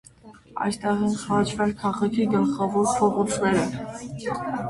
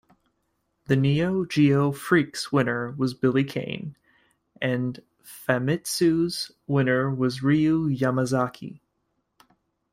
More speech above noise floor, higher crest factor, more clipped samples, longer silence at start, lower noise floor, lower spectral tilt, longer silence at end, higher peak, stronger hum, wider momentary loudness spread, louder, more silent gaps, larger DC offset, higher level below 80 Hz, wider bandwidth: second, 25 dB vs 51 dB; about the same, 16 dB vs 20 dB; neither; second, 0.25 s vs 0.9 s; second, -49 dBFS vs -75 dBFS; about the same, -5.5 dB/octave vs -6 dB/octave; second, 0 s vs 1.15 s; about the same, -8 dBFS vs -6 dBFS; neither; about the same, 9 LU vs 11 LU; about the same, -24 LUFS vs -24 LUFS; neither; neither; first, -54 dBFS vs -60 dBFS; second, 11.5 kHz vs 16 kHz